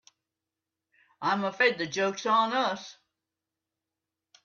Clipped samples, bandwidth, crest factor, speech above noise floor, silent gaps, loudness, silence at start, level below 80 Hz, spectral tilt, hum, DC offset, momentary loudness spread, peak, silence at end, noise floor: under 0.1%; 7.4 kHz; 20 dB; 61 dB; none; -27 LUFS; 1.2 s; -80 dBFS; -3.5 dB/octave; none; under 0.1%; 9 LU; -10 dBFS; 1.5 s; -88 dBFS